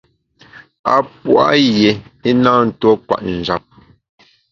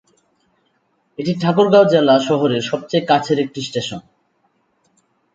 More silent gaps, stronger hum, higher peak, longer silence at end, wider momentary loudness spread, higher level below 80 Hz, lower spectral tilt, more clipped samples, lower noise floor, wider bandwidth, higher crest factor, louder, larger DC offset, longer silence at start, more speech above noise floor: first, 0.79-0.84 s vs none; neither; about the same, 0 dBFS vs 0 dBFS; second, 0.95 s vs 1.35 s; second, 9 LU vs 14 LU; first, -48 dBFS vs -62 dBFS; about the same, -6 dB/octave vs -6 dB/octave; neither; second, -48 dBFS vs -64 dBFS; second, 7.4 kHz vs 9 kHz; about the same, 16 dB vs 18 dB; about the same, -14 LUFS vs -16 LUFS; neither; second, 0.55 s vs 1.2 s; second, 35 dB vs 49 dB